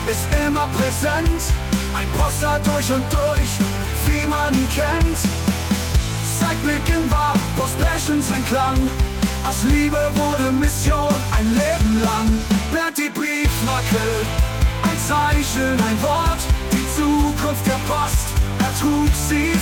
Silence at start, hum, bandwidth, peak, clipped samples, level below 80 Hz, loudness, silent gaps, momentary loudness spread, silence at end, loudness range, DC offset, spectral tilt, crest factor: 0 s; none; 18 kHz; -6 dBFS; under 0.1%; -24 dBFS; -19 LUFS; none; 3 LU; 0 s; 1 LU; under 0.1%; -5 dB/octave; 12 dB